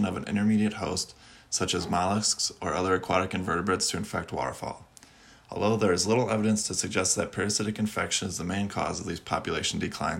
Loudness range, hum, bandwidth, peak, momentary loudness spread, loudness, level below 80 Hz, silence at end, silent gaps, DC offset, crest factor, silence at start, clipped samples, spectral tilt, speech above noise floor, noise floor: 2 LU; none; 16 kHz; -10 dBFS; 8 LU; -28 LUFS; -58 dBFS; 0 s; none; under 0.1%; 18 dB; 0 s; under 0.1%; -3.5 dB/octave; 26 dB; -54 dBFS